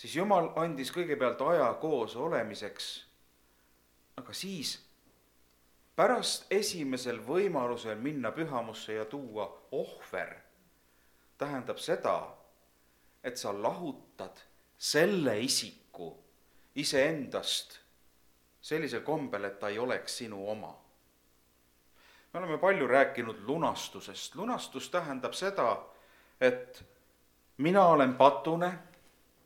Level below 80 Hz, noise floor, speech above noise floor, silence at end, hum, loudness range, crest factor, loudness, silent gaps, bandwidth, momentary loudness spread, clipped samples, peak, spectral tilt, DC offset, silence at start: -74 dBFS; -68 dBFS; 36 dB; 0.6 s; 60 Hz at -70 dBFS; 9 LU; 26 dB; -32 LUFS; none; 18.5 kHz; 16 LU; under 0.1%; -8 dBFS; -4 dB/octave; under 0.1%; 0 s